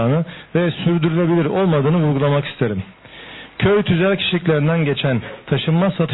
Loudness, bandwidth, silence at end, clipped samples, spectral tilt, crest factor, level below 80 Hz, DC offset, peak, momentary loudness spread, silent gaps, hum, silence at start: -18 LUFS; 4.1 kHz; 0 s; under 0.1%; -11.5 dB/octave; 12 dB; -50 dBFS; under 0.1%; -6 dBFS; 9 LU; none; none; 0 s